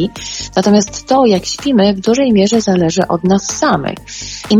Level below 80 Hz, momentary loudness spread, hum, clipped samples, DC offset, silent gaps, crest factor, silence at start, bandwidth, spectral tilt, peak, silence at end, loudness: -42 dBFS; 11 LU; none; under 0.1%; under 0.1%; none; 12 dB; 0 s; 12 kHz; -5 dB/octave; 0 dBFS; 0 s; -13 LUFS